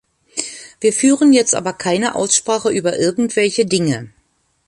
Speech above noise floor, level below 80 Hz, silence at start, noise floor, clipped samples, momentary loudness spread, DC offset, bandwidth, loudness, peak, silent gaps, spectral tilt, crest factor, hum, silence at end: 46 dB; -58 dBFS; 0.35 s; -61 dBFS; under 0.1%; 13 LU; under 0.1%; 11.5 kHz; -16 LUFS; 0 dBFS; none; -3.5 dB/octave; 16 dB; none; 0.6 s